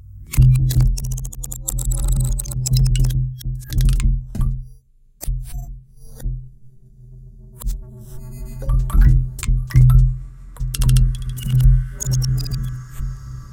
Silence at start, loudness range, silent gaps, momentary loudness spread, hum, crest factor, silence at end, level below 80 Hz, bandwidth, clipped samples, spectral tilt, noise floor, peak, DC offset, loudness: 0.1 s; 15 LU; none; 18 LU; none; 16 dB; 0 s; -20 dBFS; 17 kHz; under 0.1%; -5.5 dB/octave; -48 dBFS; -2 dBFS; under 0.1%; -20 LUFS